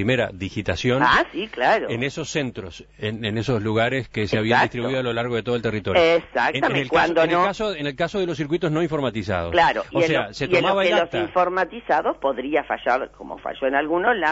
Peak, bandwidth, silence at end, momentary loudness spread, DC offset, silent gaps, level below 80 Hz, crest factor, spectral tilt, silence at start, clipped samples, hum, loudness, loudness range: -4 dBFS; 8 kHz; 0 s; 8 LU; under 0.1%; none; -48 dBFS; 18 dB; -5.5 dB/octave; 0 s; under 0.1%; none; -21 LUFS; 3 LU